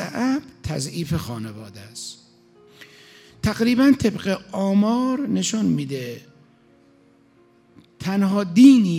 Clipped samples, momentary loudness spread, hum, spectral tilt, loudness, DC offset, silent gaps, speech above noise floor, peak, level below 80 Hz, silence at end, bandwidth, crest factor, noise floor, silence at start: under 0.1%; 18 LU; none; -5.5 dB/octave; -20 LUFS; under 0.1%; none; 37 dB; -2 dBFS; -52 dBFS; 0 s; 15 kHz; 20 dB; -56 dBFS; 0 s